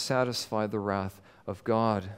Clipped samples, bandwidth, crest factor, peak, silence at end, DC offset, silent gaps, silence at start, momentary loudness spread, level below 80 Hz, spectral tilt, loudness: under 0.1%; 16 kHz; 18 dB; -12 dBFS; 0 s; under 0.1%; none; 0 s; 13 LU; -66 dBFS; -5 dB/octave; -30 LUFS